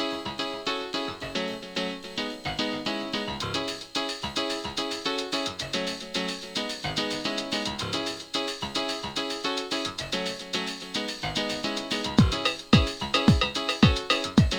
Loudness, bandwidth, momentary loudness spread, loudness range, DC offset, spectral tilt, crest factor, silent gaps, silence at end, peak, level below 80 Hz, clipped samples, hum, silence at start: -28 LUFS; over 20 kHz; 9 LU; 6 LU; under 0.1%; -4.5 dB/octave; 24 dB; none; 0 s; -4 dBFS; -40 dBFS; under 0.1%; none; 0 s